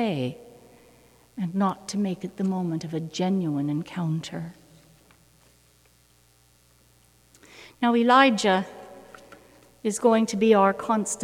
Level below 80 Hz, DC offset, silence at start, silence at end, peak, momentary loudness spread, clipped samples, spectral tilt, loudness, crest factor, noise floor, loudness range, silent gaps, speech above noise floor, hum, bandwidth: -66 dBFS; under 0.1%; 0 s; 0 s; -4 dBFS; 18 LU; under 0.1%; -5 dB/octave; -24 LUFS; 22 dB; -60 dBFS; 13 LU; none; 37 dB; none; 15.5 kHz